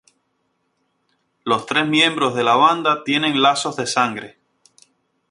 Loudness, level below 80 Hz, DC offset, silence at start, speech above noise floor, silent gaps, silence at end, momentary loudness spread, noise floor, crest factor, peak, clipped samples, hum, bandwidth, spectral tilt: -17 LUFS; -66 dBFS; under 0.1%; 1.45 s; 52 dB; none; 1 s; 8 LU; -69 dBFS; 18 dB; -2 dBFS; under 0.1%; none; 11.5 kHz; -3.5 dB/octave